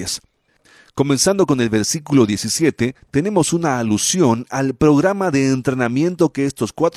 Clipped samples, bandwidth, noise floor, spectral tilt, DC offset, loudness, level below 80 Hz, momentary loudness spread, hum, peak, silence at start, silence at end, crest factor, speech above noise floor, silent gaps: under 0.1%; 15.5 kHz; -57 dBFS; -4.5 dB/octave; under 0.1%; -17 LUFS; -48 dBFS; 7 LU; none; -2 dBFS; 0 s; 0.05 s; 14 dB; 40 dB; none